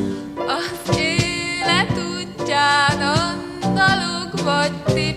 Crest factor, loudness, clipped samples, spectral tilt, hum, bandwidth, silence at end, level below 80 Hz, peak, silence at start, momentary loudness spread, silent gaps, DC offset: 16 dB; -19 LUFS; under 0.1%; -4 dB/octave; none; 15 kHz; 0 s; -44 dBFS; -2 dBFS; 0 s; 8 LU; none; under 0.1%